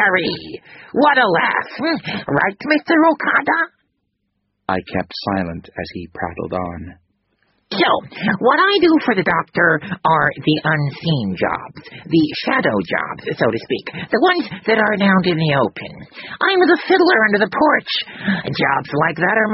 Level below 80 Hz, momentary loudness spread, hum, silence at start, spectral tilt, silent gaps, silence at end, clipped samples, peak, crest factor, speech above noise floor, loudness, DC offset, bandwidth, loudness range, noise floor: -52 dBFS; 13 LU; none; 0 s; -3.5 dB/octave; none; 0 s; under 0.1%; 0 dBFS; 16 dB; 54 dB; -17 LUFS; under 0.1%; 6 kHz; 7 LU; -71 dBFS